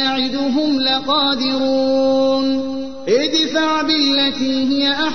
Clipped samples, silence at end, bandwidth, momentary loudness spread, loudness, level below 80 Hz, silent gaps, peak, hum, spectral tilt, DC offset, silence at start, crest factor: under 0.1%; 0 s; 6.6 kHz; 4 LU; -16 LUFS; -52 dBFS; none; -6 dBFS; none; -3.5 dB/octave; 2%; 0 s; 12 dB